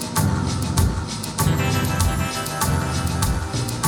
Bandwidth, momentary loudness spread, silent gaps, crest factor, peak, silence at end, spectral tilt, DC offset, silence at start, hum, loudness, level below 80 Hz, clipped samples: 19.5 kHz; 4 LU; none; 14 dB; -8 dBFS; 0 s; -4.5 dB/octave; under 0.1%; 0 s; none; -22 LUFS; -30 dBFS; under 0.1%